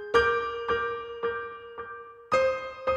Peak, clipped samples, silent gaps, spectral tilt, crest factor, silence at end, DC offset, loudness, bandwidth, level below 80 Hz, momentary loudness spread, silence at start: -10 dBFS; under 0.1%; none; -4 dB/octave; 18 dB; 0 s; under 0.1%; -28 LUFS; 9.8 kHz; -54 dBFS; 16 LU; 0 s